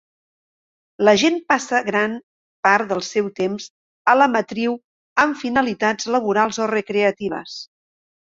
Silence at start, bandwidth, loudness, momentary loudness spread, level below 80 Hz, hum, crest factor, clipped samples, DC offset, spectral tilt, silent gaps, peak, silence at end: 1 s; 7.8 kHz; -19 LUFS; 12 LU; -62 dBFS; none; 20 dB; under 0.1%; under 0.1%; -4 dB/octave; 2.23-2.63 s, 3.70-4.05 s, 4.84-5.16 s; 0 dBFS; 0.65 s